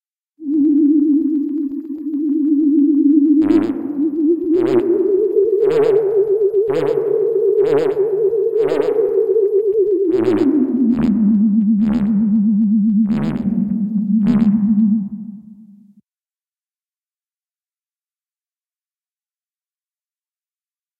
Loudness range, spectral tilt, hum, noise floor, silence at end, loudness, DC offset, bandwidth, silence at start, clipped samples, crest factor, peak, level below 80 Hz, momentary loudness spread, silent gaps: 4 LU; -10 dB/octave; none; under -90 dBFS; 5.45 s; -16 LUFS; under 0.1%; 7.4 kHz; 0.4 s; under 0.1%; 14 dB; -2 dBFS; -52 dBFS; 6 LU; none